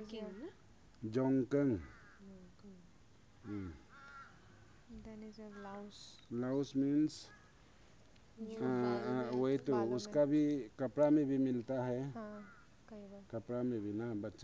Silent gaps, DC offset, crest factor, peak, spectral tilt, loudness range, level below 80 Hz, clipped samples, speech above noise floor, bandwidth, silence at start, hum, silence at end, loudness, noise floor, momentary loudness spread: none; under 0.1%; 18 dB; -22 dBFS; -7.5 dB/octave; 17 LU; -68 dBFS; under 0.1%; 28 dB; 8 kHz; 0 s; none; 0 s; -37 LUFS; -65 dBFS; 23 LU